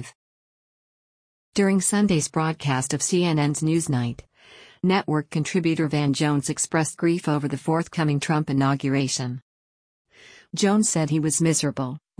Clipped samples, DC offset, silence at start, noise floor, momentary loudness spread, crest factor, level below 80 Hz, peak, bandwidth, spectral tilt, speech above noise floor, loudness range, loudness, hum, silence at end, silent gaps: under 0.1%; under 0.1%; 0 s; -50 dBFS; 7 LU; 16 dB; -58 dBFS; -8 dBFS; 10.5 kHz; -5 dB/octave; 28 dB; 2 LU; -23 LUFS; none; 0.2 s; 0.15-1.52 s, 9.42-10.05 s